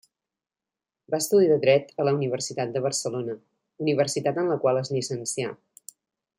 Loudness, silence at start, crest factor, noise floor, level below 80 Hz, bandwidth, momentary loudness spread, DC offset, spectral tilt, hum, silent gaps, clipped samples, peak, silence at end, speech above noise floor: -25 LUFS; 1.1 s; 18 dB; under -90 dBFS; -72 dBFS; 16.5 kHz; 12 LU; under 0.1%; -4.5 dB/octave; none; none; under 0.1%; -8 dBFS; 0.85 s; over 66 dB